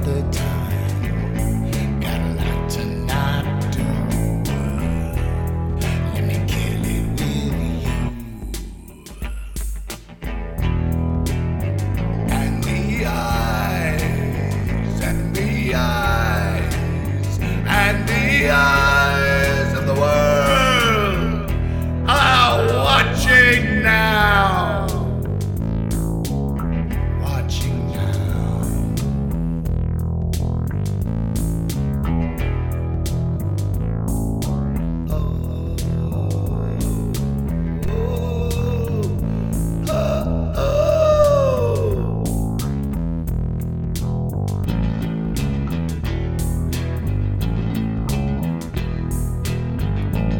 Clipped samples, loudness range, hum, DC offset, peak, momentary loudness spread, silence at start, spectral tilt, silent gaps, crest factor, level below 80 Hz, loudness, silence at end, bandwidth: under 0.1%; 8 LU; none; 0.4%; 0 dBFS; 9 LU; 0 s; -6 dB/octave; none; 18 dB; -28 dBFS; -20 LUFS; 0 s; 18 kHz